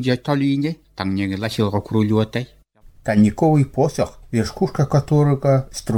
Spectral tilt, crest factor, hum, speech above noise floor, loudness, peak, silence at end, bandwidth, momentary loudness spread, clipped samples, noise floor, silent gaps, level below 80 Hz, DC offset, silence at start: -7 dB/octave; 14 dB; none; 29 dB; -19 LUFS; -4 dBFS; 0 s; 15.5 kHz; 9 LU; under 0.1%; -47 dBFS; none; -44 dBFS; under 0.1%; 0 s